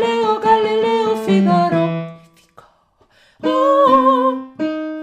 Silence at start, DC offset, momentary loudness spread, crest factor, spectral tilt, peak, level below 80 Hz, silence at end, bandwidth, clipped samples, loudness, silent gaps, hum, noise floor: 0 s; under 0.1%; 12 LU; 14 dB; -7 dB/octave; -2 dBFS; -58 dBFS; 0 s; 14 kHz; under 0.1%; -16 LUFS; none; none; -56 dBFS